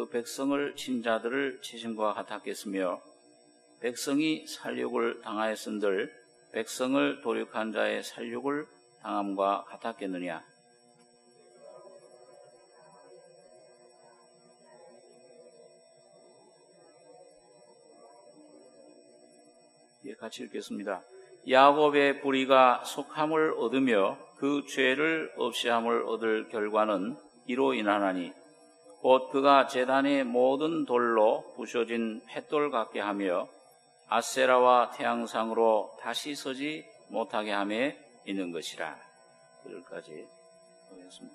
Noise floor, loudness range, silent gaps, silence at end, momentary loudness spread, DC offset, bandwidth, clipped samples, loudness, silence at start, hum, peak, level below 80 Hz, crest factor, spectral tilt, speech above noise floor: -62 dBFS; 11 LU; none; 0.05 s; 16 LU; under 0.1%; 13 kHz; under 0.1%; -29 LUFS; 0 s; none; -6 dBFS; -88 dBFS; 24 dB; -4 dB/octave; 33 dB